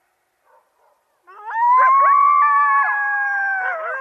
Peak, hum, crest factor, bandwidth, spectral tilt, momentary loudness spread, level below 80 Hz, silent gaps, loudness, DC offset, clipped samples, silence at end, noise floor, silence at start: -4 dBFS; none; 12 dB; 6 kHz; 0.5 dB/octave; 9 LU; under -90 dBFS; none; -15 LUFS; under 0.1%; under 0.1%; 0 s; -64 dBFS; 1.35 s